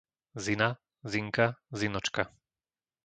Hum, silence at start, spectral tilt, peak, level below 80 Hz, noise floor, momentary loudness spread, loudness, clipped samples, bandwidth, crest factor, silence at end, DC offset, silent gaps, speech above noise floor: none; 0.35 s; -4.5 dB/octave; -8 dBFS; -62 dBFS; under -90 dBFS; 9 LU; -32 LUFS; under 0.1%; 9.4 kHz; 24 dB; 0.75 s; under 0.1%; none; over 59 dB